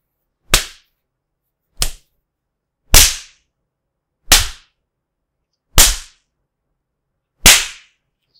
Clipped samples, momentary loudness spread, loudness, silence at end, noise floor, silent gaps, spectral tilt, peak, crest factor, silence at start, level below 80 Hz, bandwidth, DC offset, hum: 0.3%; 18 LU; -12 LUFS; 0.65 s; -77 dBFS; none; -0.5 dB/octave; 0 dBFS; 18 dB; 0.5 s; -24 dBFS; over 20 kHz; under 0.1%; none